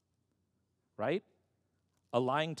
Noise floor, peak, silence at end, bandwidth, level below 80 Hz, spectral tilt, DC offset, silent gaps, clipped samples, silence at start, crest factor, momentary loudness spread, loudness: -80 dBFS; -16 dBFS; 0 s; 11.5 kHz; under -90 dBFS; -6 dB/octave; under 0.1%; none; under 0.1%; 1 s; 22 dB; 7 LU; -35 LUFS